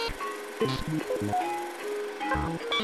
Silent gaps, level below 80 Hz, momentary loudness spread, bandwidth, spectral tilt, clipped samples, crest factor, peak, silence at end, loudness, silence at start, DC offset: none; -46 dBFS; 5 LU; 15.5 kHz; -5 dB/octave; under 0.1%; 16 dB; -16 dBFS; 0 s; -31 LUFS; 0 s; under 0.1%